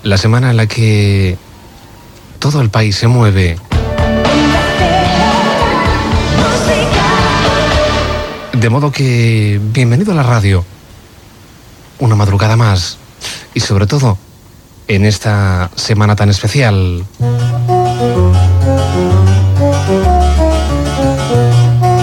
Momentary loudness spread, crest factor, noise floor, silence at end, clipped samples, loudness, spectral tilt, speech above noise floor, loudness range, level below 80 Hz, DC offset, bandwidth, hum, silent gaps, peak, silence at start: 6 LU; 10 dB; -38 dBFS; 0 s; under 0.1%; -11 LUFS; -6 dB/octave; 28 dB; 3 LU; -22 dBFS; under 0.1%; 16.5 kHz; none; none; 0 dBFS; 0.05 s